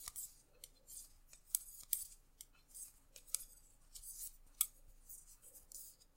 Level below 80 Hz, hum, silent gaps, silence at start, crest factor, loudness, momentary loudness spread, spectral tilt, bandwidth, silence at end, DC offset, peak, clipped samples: -66 dBFS; none; none; 0 s; 38 dB; -45 LUFS; 20 LU; 1.5 dB/octave; 16.5 kHz; 0.05 s; under 0.1%; -12 dBFS; under 0.1%